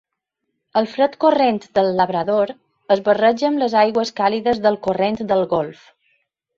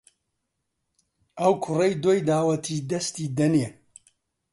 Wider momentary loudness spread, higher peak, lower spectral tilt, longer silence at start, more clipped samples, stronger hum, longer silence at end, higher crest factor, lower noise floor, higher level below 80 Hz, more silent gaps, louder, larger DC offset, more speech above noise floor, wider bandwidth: about the same, 6 LU vs 7 LU; first, -2 dBFS vs -8 dBFS; about the same, -6 dB/octave vs -6 dB/octave; second, 0.75 s vs 1.35 s; neither; neither; about the same, 0.85 s vs 0.8 s; about the same, 16 dB vs 18 dB; about the same, -77 dBFS vs -79 dBFS; first, -58 dBFS vs -66 dBFS; neither; first, -18 LUFS vs -24 LUFS; neither; first, 60 dB vs 56 dB; second, 7.4 kHz vs 11.5 kHz